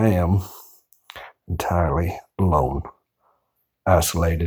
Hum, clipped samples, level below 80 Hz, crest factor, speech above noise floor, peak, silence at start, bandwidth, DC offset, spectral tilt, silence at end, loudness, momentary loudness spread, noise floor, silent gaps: none; under 0.1%; -34 dBFS; 18 dB; 52 dB; -4 dBFS; 0 s; over 20 kHz; under 0.1%; -6 dB/octave; 0 s; -22 LUFS; 21 LU; -73 dBFS; none